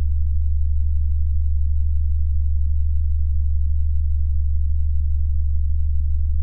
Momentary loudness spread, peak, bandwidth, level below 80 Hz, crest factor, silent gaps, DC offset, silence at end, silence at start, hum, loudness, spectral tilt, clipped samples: 1 LU; -10 dBFS; 0.2 kHz; -20 dBFS; 8 dB; none; under 0.1%; 0 s; 0 s; none; -23 LUFS; -13 dB/octave; under 0.1%